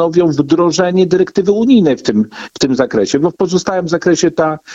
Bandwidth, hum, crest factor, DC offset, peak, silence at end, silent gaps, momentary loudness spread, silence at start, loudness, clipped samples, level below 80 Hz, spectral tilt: 8 kHz; none; 12 dB; under 0.1%; 0 dBFS; 0 s; none; 6 LU; 0 s; -13 LUFS; under 0.1%; -48 dBFS; -5.5 dB/octave